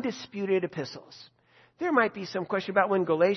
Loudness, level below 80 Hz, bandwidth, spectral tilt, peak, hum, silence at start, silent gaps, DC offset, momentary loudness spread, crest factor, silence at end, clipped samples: -28 LUFS; -76 dBFS; 6.4 kHz; -6 dB/octave; -8 dBFS; none; 0 s; none; under 0.1%; 11 LU; 20 dB; 0 s; under 0.1%